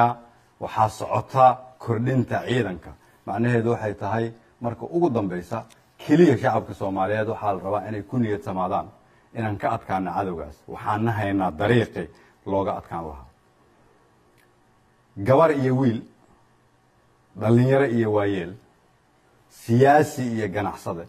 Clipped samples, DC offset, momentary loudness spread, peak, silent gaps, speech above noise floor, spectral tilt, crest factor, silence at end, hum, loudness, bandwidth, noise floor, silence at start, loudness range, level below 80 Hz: under 0.1%; under 0.1%; 16 LU; -4 dBFS; none; 38 dB; -7.5 dB/octave; 20 dB; 0 s; none; -23 LUFS; 14 kHz; -60 dBFS; 0 s; 5 LU; -56 dBFS